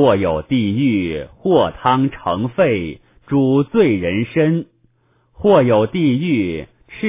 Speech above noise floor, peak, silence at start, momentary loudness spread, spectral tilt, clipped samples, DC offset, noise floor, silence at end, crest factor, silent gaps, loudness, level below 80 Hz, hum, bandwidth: 43 dB; 0 dBFS; 0 s; 9 LU; -11.5 dB/octave; under 0.1%; under 0.1%; -59 dBFS; 0 s; 16 dB; none; -17 LUFS; -42 dBFS; none; 3.8 kHz